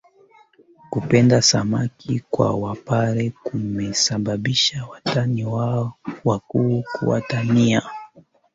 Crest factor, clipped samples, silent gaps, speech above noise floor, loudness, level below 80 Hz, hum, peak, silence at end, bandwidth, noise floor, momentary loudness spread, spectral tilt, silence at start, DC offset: 18 dB; under 0.1%; none; 33 dB; -20 LUFS; -52 dBFS; none; -2 dBFS; 0.35 s; 8 kHz; -53 dBFS; 11 LU; -5 dB/octave; 0.9 s; under 0.1%